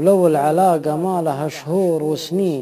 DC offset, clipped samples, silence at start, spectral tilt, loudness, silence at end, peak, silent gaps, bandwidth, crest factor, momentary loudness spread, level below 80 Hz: under 0.1%; under 0.1%; 0 s; -6.5 dB/octave; -18 LUFS; 0 s; -4 dBFS; none; 15 kHz; 14 dB; 7 LU; -70 dBFS